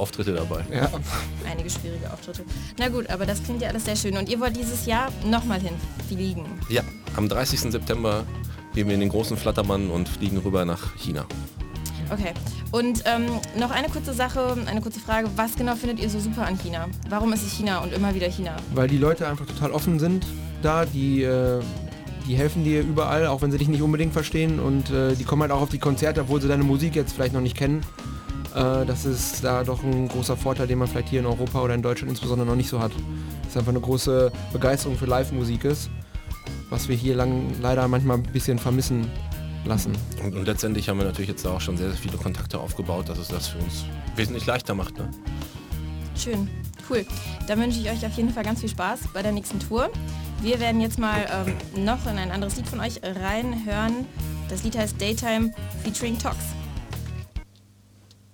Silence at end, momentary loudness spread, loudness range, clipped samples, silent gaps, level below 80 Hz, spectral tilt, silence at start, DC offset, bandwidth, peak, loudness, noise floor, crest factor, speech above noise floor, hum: 0.9 s; 10 LU; 5 LU; under 0.1%; none; -36 dBFS; -5.5 dB/octave; 0 s; under 0.1%; over 20 kHz; -6 dBFS; -26 LUFS; -53 dBFS; 18 dB; 29 dB; none